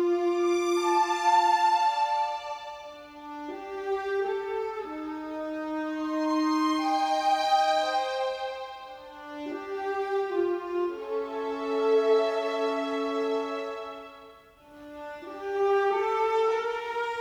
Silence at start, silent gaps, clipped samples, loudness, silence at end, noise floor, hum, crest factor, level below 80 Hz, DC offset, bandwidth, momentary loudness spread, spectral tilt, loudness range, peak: 0 s; none; under 0.1%; -28 LUFS; 0 s; -52 dBFS; none; 16 dB; -68 dBFS; under 0.1%; 15 kHz; 17 LU; -2.5 dB/octave; 6 LU; -12 dBFS